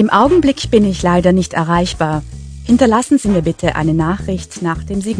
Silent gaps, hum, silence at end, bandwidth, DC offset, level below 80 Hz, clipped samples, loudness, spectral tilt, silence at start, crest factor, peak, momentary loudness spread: none; none; 0 s; 10.5 kHz; under 0.1%; -32 dBFS; under 0.1%; -14 LUFS; -6 dB/octave; 0 s; 14 dB; 0 dBFS; 10 LU